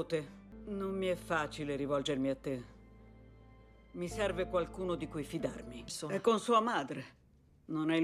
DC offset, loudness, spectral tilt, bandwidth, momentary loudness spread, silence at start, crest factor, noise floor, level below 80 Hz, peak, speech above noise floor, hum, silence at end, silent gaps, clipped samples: under 0.1%; -36 LUFS; -5 dB/octave; 15 kHz; 15 LU; 0 s; 20 dB; -59 dBFS; -58 dBFS; -16 dBFS; 24 dB; none; 0 s; none; under 0.1%